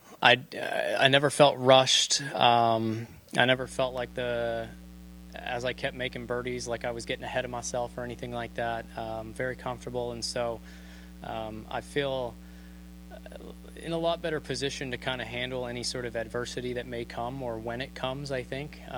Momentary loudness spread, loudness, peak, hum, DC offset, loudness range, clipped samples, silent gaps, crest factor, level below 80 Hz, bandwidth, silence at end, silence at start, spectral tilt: 22 LU; -29 LUFS; -4 dBFS; none; under 0.1%; 12 LU; under 0.1%; none; 26 dB; -50 dBFS; over 20 kHz; 0 s; 0.05 s; -3.5 dB/octave